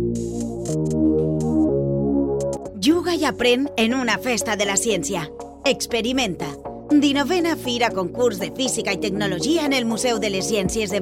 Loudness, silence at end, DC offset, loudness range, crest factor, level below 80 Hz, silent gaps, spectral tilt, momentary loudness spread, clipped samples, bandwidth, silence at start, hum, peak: -21 LUFS; 0 s; under 0.1%; 1 LU; 16 dB; -42 dBFS; none; -4 dB/octave; 7 LU; under 0.1%; 16.5 kHz; 0 s; none; -6 dBFS